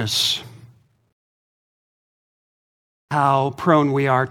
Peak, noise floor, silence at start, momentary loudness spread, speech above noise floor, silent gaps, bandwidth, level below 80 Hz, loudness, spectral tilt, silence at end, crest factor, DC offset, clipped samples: -2 dBFS; -51 dBFS; 0 s; 6 LU; 32 dB; 1.12-3.08 s; 18 kHz; -64 dBFS; -19 LUFS; -4.5 dB/octave; 0 s; 22 dB; under 0.1%; under 0.1%